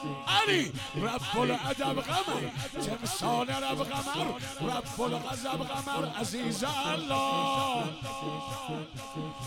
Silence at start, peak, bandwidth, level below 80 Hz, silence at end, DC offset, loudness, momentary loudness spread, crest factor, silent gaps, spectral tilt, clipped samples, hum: 0 s; -12 dBFS; 17.5 kHz; -56 dBFS; 0 s; under 0.1%; -31 LUFS; 8 LU; 20 dB; none; -4 dB/octave; under 0.1%; none